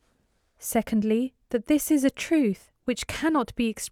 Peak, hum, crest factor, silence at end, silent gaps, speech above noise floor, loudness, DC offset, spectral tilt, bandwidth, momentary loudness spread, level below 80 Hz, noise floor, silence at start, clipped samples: -10 dBFS; none; 16 dB; 0.05 s; none; 44 dB; -26 LUFS; under 0.1%; -4.5 dB/octave; 17 kHz; 8 LU; -52 dBFS; -69 dBFS; 0.6 s; under 0.1%